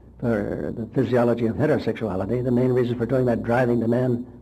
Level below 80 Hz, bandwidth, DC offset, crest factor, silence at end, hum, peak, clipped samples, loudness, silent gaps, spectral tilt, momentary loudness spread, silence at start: -48 dBFS; 13 kHz; under 0.1%; 12 dB; 0 s; none; -10 dBFS; under 0.1%; -23 LUFS; none; -9 dB/octave; 6 LU; 0.05 s